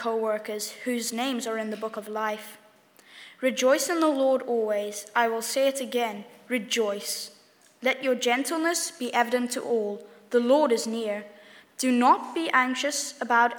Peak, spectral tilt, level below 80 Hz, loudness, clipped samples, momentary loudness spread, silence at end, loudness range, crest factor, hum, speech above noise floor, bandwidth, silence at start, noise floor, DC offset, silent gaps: -8 dBFS; -2 dB/octave; under -90 dBFS; -26 LUFS; under 0.1%; 11 LU; 0 s; 4 LU; 20 dB; none; 31 dB; over 20 kHz; 0 s; -56 dBFS; under 0.1%; none